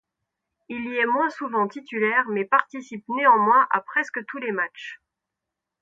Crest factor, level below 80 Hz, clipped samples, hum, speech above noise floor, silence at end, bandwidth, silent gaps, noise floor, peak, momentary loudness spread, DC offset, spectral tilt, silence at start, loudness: 22 dB; -74 dBFS; under 0.1%; none; 62 dB; 0.85 s; 7.8 kHz; none; -85 dBFS; -2 dBFS; 17 LU; under 0.1%; -5.5 dB/octave; 0.7 s; -22 LUFS